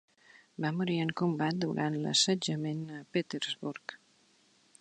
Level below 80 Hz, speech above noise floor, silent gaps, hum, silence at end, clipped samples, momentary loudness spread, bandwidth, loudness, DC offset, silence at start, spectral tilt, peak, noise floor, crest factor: -76 dBFS; 35 dB; none; none; 0.85 s; under 0.1%; 13 LU; 10 kHz; -32 LUFS; under 0.1%; 0.6 s; -4 dB/octave; -14 dBFS; -67 dBFS; 20 dB